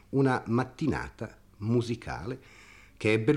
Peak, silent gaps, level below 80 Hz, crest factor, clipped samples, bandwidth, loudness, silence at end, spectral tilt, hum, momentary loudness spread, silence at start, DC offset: -12 dBFS; none; -54 dBFS; 18 dB; under 0.1%; 11.5 kHz; -30 LUFS; 0 s; -7 dB/octave; none; 15 LU; 0.1 s; under 0.1%